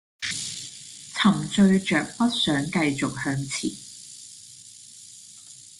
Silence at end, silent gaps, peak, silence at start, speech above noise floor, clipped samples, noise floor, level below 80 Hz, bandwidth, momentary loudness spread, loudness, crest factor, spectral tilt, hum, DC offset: 0.1 s; none; -6 dBFS; 0.2 s; 24 dB; under 0.1%; -47 dBFS; -60 dBFS; 12.5 kHz; 23 LU; -24 LUFS; 20 dB; -4.5 dB/octave; none; under 0.1%